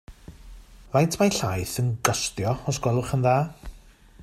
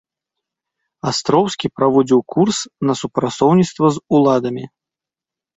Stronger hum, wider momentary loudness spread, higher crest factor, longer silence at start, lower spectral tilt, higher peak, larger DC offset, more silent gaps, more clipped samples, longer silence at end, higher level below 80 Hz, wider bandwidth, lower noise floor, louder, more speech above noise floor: neither; about the same, 6 LU vs 8 LU; about the same, 22 dB vs 18 dB; second, 0.1 s vs 1.05 s; about the same, -5 dB/octave vs -6 dB/octave; about the same, -2 dBFS vs 0 dBFS; neither; neither; neither; second, 0 s vs 0.9 s; first, -46 dBFS vs -56 dBFS; first, 15.5 kHz vs 8.2 kHz; second, -50 dBFS vs -88 dBFS; second, -24 LUFS vs -16 LUFS; second, 26 dB vs 72 dB